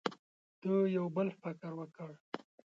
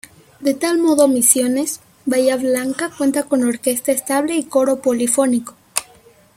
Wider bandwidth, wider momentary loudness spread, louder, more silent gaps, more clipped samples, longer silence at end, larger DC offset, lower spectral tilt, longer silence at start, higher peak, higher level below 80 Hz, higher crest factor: second, 7.6 kHz vs 16.5 kHz; first, 16 LU vs 11 LU; second, -37 LUFS vs -17 LUFS; first, 0.19-0.62 s, 2.20-2.32 s vs none; neither; about the same, 0.45 s vs 0.55 s; neither; first, -8 dB/octave vs -2.5 dB/octave; second, 0.05 s vs 0.4 s; second, -16 dBFS vs 0 dBFS; second, -84 dBFS vs -62 dBFS; about the same, 22 dB vs 18 dB